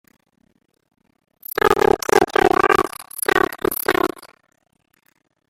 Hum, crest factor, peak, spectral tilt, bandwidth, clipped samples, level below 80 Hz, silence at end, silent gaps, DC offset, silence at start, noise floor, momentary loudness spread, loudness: none; 20 dB; -2 dBFS; -3.5 dB/octave; 17 kHz; under 0.1%; -46 dBFS; 1.25 s; none; under 0.1%; 1.65 s; -47 dBFS; 10 LU; -18 LUFS